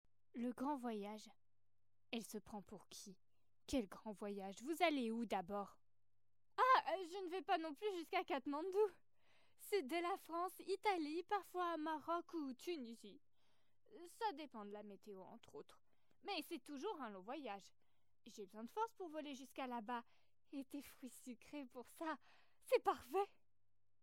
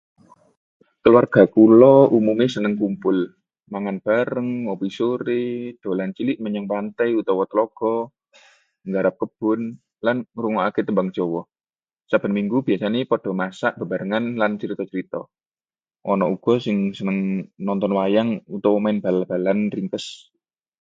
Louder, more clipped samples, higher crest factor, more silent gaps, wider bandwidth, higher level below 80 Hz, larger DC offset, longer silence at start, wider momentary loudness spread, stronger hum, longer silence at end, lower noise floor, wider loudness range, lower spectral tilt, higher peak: second, -45 LUFS vs -20 LUFS; neither; about the same, 22 dB vs 20 dB; second, none vs 15.46-15.51 s; first, 16.5 kHz vs 7.8 kHz; second, -80 dBFS vs -64 dBFS; neither; second, 0.35 s vs 1.05 s; first, 17 LU vs 12 LU; neither; about the same, 0.75 s vs 0.7 s; about the same, under -90 dBFS vs under -90 dBFS; about the same, 10 LU vs 8 LU; second, -4 dB/octave vs -8 dB/octave; second, -24 dBFS vs 0 dBFS